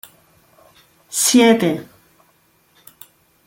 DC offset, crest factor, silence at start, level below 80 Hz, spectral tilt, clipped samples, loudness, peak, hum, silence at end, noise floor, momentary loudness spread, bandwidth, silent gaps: under 0.1%; 20 dB; 1.1 s; -64 dBFS; -3 dB/octave; under 0.1%; -15 LUFS; -2 dBFS; none; 1.65 s; -58 dBFS; 14 LU; 17 kHz; none